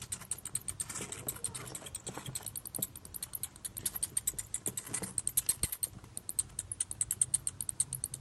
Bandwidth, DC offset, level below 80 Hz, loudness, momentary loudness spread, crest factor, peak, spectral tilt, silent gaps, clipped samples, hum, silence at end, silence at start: 15.5 kHz; under 0.1%; -60 dBFS; -36 LUFS; 10 LU; 26 dB; -12 dBFS; -1.5 dB/octave; none; under 0.1%; none; 0 s; 0 s